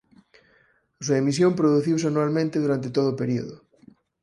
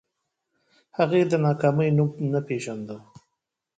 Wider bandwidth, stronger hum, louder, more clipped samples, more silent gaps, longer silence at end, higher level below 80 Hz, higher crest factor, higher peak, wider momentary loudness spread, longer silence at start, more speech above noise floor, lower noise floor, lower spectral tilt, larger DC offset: first, 11.5 kHz vs 9.2 kHz; neither; about the same, -23 LUFS vs -23 LUFS; neither; neither; about the same, 0.65 s vs 0.75 s; about the same, -64 dBFS vs -64 dBFS; about the same, 16 dB vs 18 dB; about the same, -8 dBFS vs -8 dBFS; second, 8 LU vs 16 LU; about the same, 1 s vs 1 s; second, 40 dB vs 59 dB; second, -62 dBFS vs -82 dBFS; second, -6.5 dB/octave vs -8 dB/octave; neither